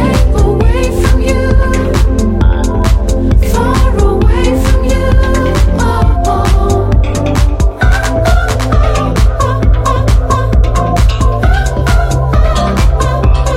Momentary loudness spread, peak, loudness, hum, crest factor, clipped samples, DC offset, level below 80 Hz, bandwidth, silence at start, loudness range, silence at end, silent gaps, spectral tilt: 1 LU; 0 dBFS; -11 LUFS; none; 8 dB; under 0.1%; under 0.1%; -10 dBFS; 14 kHz; 0 s; 1 LU; 0 s; none; -6.5 dB/octave